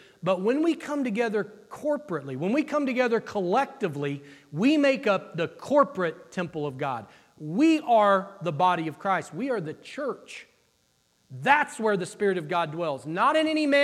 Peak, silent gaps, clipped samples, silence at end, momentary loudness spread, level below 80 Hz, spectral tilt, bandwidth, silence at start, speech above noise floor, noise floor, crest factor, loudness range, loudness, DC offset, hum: -6 dBFS; none; under 0.1%; 0 s; 11 LU; -76 dBFS; -6 dB/octave; 13 kHz; 0.25 s; 43 dB; -68 dBFS; 20 dB; 3 LU; -26 LUFS; under 0.1%; none